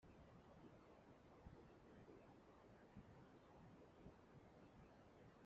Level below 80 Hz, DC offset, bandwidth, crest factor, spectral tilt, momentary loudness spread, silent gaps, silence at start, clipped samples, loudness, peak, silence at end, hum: -78 dBFS; under 0.1%; 7.2 kHz; 18 dB; -6.5 dB/octave; 3 LU; none; 0 s; under 0.1%; -67 LUFS; -48 dBFS; 0 s; none